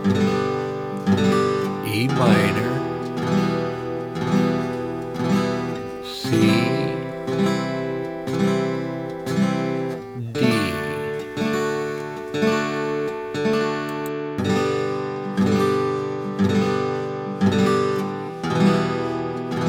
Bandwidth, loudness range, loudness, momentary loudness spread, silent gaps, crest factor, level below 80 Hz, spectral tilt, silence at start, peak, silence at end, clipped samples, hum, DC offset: 16.5 kHz; 3 LU; -22 LUFS; 9 LU; none; 18 dB; -56 dBFS; -6.5 dB/octave; 0 s; -4 dBFS; 0 s; under 0.1%; none; under 0.1%